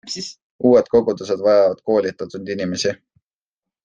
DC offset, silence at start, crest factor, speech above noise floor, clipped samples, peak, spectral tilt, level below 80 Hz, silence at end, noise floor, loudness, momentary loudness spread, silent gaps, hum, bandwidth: under 0.1%; 0.05 s; 16 dB; 70 dB; under 0.1%; -2 dBFS; -5 dB/octave; -58 dBFS; 0.9 s; -88 dBFS; -18 LUFS; 14 LU; 0.42-0.59 s; none; 9.4 kHz